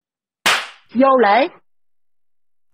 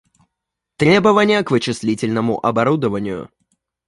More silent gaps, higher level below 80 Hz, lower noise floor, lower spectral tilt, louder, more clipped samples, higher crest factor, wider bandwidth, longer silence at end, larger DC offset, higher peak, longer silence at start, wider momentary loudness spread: neither; second, -66 dBFS vs -52 dBFS; first, under -90 dBFS vs -80 dBFS; second, -2.5 dB/octave vs -6 dB/octave; about the same, -16 LUFS vs -17 LUFS; neither; about the same, 16 dB vs 16 dB; first, 16 kHz vs 11.5 kHz; first, 1.25 s vs 0.6 s; neither; about the same, -2 dBFS vs -2 dBFS; second, 0.45 s vs 0.8 s; about the same, 10 LU vs 10 LU